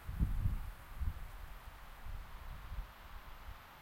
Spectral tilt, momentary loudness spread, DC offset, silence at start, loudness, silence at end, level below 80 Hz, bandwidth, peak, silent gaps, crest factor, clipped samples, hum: -6.5 dB/octave; 14 LU; under 0.1%; 0 s; -47 LUFS; 0 s; -44 dBFS; 16.5 kHz; -20 dBFS; none; 22 dB; under 0.1%; none